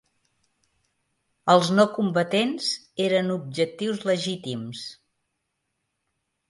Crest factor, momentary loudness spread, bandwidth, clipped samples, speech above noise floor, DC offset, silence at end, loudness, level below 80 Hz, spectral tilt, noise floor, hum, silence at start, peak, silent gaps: 22 dB; 13 LU; 11.5 kHz; under 0.1%; 55 dB; under 0.1%; 1.55 s; -24 LUFS; -72 dBFS; -5 dB/octave; -78 dBFS; none; 1.45 s; -4 dBFS; none